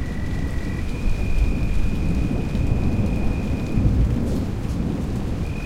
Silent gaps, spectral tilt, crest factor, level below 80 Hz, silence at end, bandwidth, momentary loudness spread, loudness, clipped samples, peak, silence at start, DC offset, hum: none; -7.5 dB/octave; 16 dB; -24 dBFS; 0 s; 13 kHz; 6 LU; -24 LUFS; under 0.1%; -6 dBFS; 0 s; under 0.1%; none